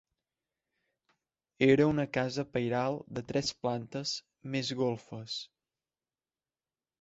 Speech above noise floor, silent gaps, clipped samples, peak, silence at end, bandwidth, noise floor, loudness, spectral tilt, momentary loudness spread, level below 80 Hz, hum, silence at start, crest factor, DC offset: over 59 dB; none; under 0.1%; -12 dBFS; 1.55 s; 8 kHz; under -90 dBFS; -32 LUFS; -5.5 dB/octave; 13 LU; -66 dBFS; none; 1.6 s; 22 dB; under 0.1%